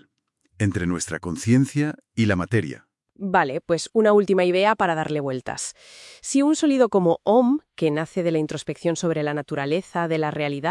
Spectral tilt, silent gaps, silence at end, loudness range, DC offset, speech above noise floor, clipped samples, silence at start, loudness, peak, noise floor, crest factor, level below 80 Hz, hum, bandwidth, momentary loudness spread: -5.5 dB/octave; none; 0 s; 3 LU; under 0.1%; 48 dB; under 0.1%; 0.6 s; -22 LUFS; -4 dBFS; -69 dBFS; 18 dB; -60 dBFS; none; 12 kHz; 10 LU